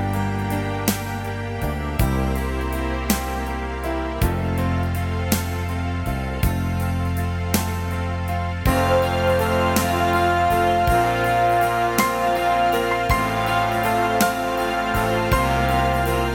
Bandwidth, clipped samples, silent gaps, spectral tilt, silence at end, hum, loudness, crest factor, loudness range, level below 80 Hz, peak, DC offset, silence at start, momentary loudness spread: 18 kHz; under 0.1%; none; -5.5 dB/octave; 0 s; none; -21 LUFS; 18 dB; 5 LU; -30 dBFS; -2 dBFS; under 0.1%; 0 s; 7 LU